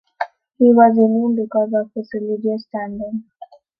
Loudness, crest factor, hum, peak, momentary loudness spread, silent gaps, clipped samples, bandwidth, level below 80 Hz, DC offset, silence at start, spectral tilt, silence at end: -17 LUFS; 16 dB; none; -2 dBFS; 17 LU; none; under 0.1%; 5.2 kHz; -62 dBFS; under 0.1%; 0.2 s; -10 dB/octave; 0.35 s